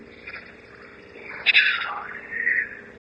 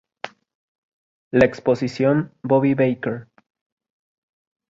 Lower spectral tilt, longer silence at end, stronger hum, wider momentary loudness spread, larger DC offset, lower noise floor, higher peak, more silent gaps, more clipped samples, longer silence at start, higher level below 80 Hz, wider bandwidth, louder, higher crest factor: second, -2.5 dB/octave vs -8 dB/octave; second, 0.1 s vs 1.45 s; neither; first, 22 LU vs 18 LU; neither; first, -45 dBFS vs -39 dBFS; about the same, -4 dBFS vs -2 dBFS; second, none vs 0.55-1.31 s; neither; second, 0 s vs 0.25 s; second, -62 dBFS vs -54 dBFS; first, 9.4 kHz vs 7.8 kHz; about the same, -21 LUFS vs -20 LUFS; about the same, 22 dB vs 20 dB